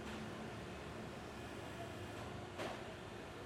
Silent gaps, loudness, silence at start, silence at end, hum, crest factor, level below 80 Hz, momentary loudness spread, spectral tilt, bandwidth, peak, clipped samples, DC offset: none; -49 LUFS; 0 s; 0 s; none; 16 dB; -64 dBFS; 3 LU; -5 dB/octave; 16.5 kHz; -34 dBFS; under 0.1%; under 0.1%